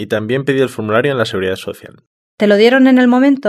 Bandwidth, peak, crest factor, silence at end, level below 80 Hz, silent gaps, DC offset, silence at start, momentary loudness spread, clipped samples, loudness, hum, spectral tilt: 13 kHz; 0 dBFS; 12 dB; 0 s; -58 dBFS; 2.07-2.38 s; under 0.1%; 0 s; 13 LU; under 0.1%; -12 LUFS; none; -6.5 dB/octave